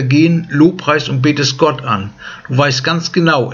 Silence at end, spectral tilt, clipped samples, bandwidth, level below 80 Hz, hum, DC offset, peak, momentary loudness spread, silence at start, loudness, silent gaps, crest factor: 0 s; -5.5 dB/octave; under 0.1%; 7.4 kHz; -52 dBFS; none; under 0.1%; 0 dBFS; 8 LU; 0 s; -13 LUFS; none; 14 dB